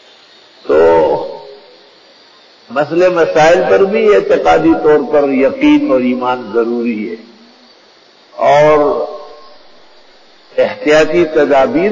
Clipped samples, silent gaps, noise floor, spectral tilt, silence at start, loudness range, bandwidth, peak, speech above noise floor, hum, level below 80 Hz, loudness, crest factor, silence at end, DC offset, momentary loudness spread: under 0.1%; none; -45 dBFS; -5.5 dB/octave; 0.65 s; 5 LU; 7.6 kHz; 0 dBFS; 35 dB; none; -44 dBFS; -11 LUFS; 12 dB; 0 s; under 0.1%; 13 LU